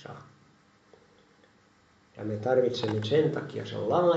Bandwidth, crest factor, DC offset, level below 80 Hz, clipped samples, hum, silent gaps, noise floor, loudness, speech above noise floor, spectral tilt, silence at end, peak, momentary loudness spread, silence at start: 8 kHz; 18 dB; under 0.1%; -74 dBFS; under 0.1%; none; none; -62 dBFS; -28 LUFS; 36 dB; -7 dB/octave; 0 s; -12 dBFS; 14 LU; 0 s